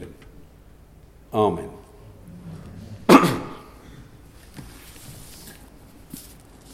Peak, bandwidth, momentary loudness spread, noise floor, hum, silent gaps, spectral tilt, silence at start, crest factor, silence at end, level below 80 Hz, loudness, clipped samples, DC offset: 0 dBFS; 16 kHz; 30 LU; -49 dBFS; none; none; -5.5 dB/octave; 0 s; 26 dB; 0.55 s; -50 dBFS; -19 LUFS; under 0.1%; under 0.1%